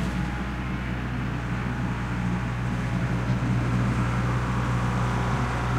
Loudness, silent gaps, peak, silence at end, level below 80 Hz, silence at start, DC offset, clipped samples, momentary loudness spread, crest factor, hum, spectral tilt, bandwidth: -27 LUFS; none; -12 dBFS; 0 s; -34 dBFS; 0 s; under 0.1%; under 0.1%; 5 LU; 14 dB; 60 Hz at -35 dBFS; -7 dB/octave; 10.5 kHz